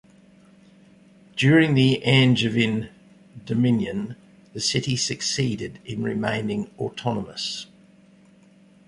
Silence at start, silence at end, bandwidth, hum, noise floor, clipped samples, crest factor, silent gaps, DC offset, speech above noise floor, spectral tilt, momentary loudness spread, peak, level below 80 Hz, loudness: 1.35 s; 1.25 s; 11.5 kHz; none; -53 dBFS; under 0.1%; 20 dB; none; under 0.1%; 31 dB; -5 dB/octave; 16 LU; -4 dBFS; -56 dBFS; -22 LUFS